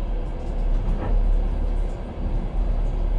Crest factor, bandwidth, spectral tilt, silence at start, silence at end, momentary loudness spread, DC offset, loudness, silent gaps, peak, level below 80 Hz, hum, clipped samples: 10 dB; 4.1 kHz; -8.5 dB/octave; 0 s; 0 s; 6 LU; under 0.1%; -28 LUFS; none; -12 dBFS; -22 dBFS; none; under 0.1%